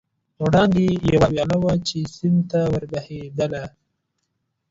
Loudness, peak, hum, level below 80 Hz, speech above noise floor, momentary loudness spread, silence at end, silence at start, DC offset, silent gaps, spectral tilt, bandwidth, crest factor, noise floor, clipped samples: -20 LUFS; -4 dBFS; none; -44 dBFS; 55 dB; 13 LU; 1.05 s; 0.4 s; under 0.1%; none; -7 dB/octave; 7.8 kHz; 16 dB; -75 dBFS; under 0.1%